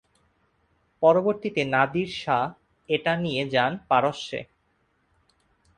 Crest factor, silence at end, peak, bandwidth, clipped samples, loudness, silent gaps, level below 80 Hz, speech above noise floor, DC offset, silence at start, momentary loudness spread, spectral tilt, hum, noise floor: 20 dB; 1.35 s; -6 dBFS; 10 kHz; under 0.1%; -24 LUFS; none; -62 dBFS; 45 dB; under 0.1%; 1 s; 10 LU; -6 dB/octave; none; -69 dBFS